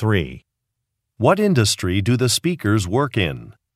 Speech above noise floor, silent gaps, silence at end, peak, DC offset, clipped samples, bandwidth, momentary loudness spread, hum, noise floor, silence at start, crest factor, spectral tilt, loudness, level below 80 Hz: 59 dB; none; 0.25 s; -2 dBFS; under 0.1%; under 0.1%; 15 kHz; 7 LU; none; -78 dBFS; 0 s; 18 dB; -5 dB/octave; -19 LUFS; -46 dBFS